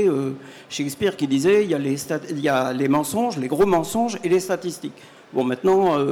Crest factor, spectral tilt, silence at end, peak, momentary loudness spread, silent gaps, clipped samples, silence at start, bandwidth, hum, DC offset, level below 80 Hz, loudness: 12 dB; -5.5 dB/octave; 0 s; -10 dBFS; 11 LU; none; under 0.1%; 0 s; 17.5 kHz; none; under 0.1%; -56 dBFS; -21 LUFS